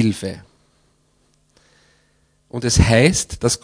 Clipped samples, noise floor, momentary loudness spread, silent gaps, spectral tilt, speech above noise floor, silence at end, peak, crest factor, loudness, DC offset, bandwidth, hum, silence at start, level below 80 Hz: under 0.1%; -61 dBFS; 18 LU; none; -4.5 dB/octave; 44 dB; 0.05 s; 0 dBFS; 20 dB; -17 LUFS; under 0.1%; 11 kHz; none; 0 s; -32 dBFS